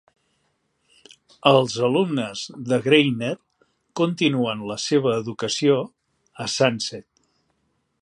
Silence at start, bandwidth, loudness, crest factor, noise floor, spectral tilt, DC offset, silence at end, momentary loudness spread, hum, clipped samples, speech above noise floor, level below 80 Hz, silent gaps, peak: 1.45 s; 11.5 kHz; -22 LUFS; 22 dB; -71 dBFS; -5 dB/octave; under 0.1%; 1 s; 13 LU; none; under 0.1%; 50 dB; -68 dBFS; none; -2 dBFS